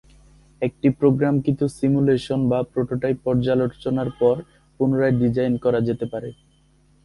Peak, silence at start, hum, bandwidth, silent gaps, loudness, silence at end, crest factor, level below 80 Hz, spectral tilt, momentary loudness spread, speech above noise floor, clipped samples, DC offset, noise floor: -4 dBFS; 0.6 s; none; 11.5 kHz; none; -21 LUFS; 0.7 s; 16 dB; -50 dBFS; -8.5 dB/octave; 9 LU; 37 dB; under 0.1%; under 0.1%; -58 dBFS